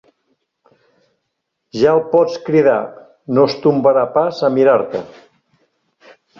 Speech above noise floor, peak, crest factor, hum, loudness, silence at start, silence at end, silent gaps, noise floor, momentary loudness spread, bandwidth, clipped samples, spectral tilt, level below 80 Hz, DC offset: 60 dB; 0 dBFS; 16 dB; none; -15 LUFS; 1.75 s; 1.35 s; none; -74 dBFS; 13 LU; 7 kHz; under 0.1%; -7 dB/octave; -60 dBFS; under 0.1%